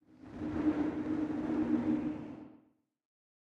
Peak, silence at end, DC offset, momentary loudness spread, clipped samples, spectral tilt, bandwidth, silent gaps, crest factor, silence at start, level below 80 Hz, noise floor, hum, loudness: -20 dBFS; 0.95 s; under 0.1%; 15 LU; under 0.1%; -8.5 dB/octave; 6.4 kHz; none; 16 dB; 0.2 s; -60 dBFS; -69 dBFS; none; -35 LUFS